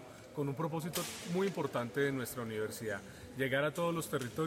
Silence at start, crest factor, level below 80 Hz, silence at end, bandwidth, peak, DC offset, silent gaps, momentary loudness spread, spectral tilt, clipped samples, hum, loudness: 0 s; 16 dB; -68 dBFS; 0 s; 16.5 kHz; -20 dBFS; under 0.1%; none; 7 LU; -5 dB/octave; under 0.1%; none; -37 LUFS